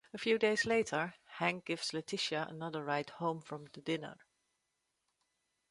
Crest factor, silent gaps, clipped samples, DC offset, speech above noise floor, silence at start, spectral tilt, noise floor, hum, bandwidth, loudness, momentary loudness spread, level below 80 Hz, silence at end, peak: 20 dB; none; under 0.1%; under 0.1%; 48 dB; 0.15 s; -4 dB/octave; -84 dBFS; none; 11.5 kHz; -36 LUFS; 11 LU; -76 dBFS; 1.55 s; -18 dBFS